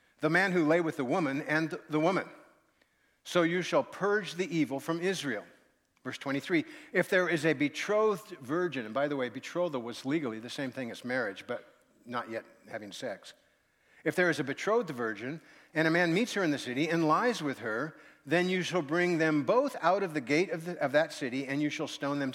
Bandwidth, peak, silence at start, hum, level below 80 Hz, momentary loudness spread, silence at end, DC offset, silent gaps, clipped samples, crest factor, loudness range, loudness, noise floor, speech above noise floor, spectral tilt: 16.5 kHz; -12 dBFS; 0.2 s; none; -82 dBFS; 12 LU; 0 s; under 0.1%; none; under 0.1%; 20 dB; 6 LU; -31 LUFS; -71 dBFS; 40 dB; -5.5 dB/octave